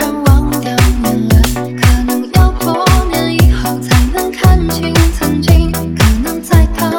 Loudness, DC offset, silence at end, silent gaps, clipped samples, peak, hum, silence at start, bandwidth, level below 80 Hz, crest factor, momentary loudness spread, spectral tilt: -12 LUFS; 0.4%; 0 s; none; 0.5%; 0 dBFS; none; 0 s; 19 kHz; -14 dBFS; 10 dB; 4 LU; -5.5 dB/octave